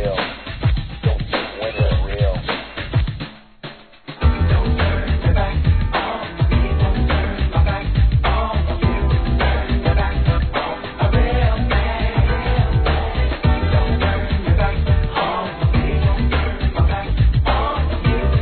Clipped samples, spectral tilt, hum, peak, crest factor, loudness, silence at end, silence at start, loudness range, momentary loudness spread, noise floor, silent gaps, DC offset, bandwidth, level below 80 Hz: under 0.1%; -10 dB/octave; none; -4 dBFS; 14 dB; -19 LUFS; 0 s; 0 s; 3 LU; 6 LU; -37 dBFS; none; 0.2%; 4.5 kHz; -20 dBFS